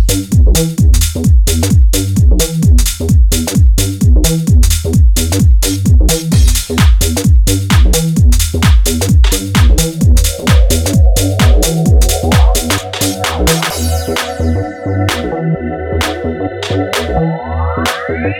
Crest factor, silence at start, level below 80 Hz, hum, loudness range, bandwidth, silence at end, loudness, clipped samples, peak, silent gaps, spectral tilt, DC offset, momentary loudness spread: 10 dB; 0 s; -12 dBFS; none; 5 LU; 17.5 kHz; 0 s; -11 LUFS; under 0.1%; 0 dBFS; none; -5 dB/octave; under 0.1%; 6 LU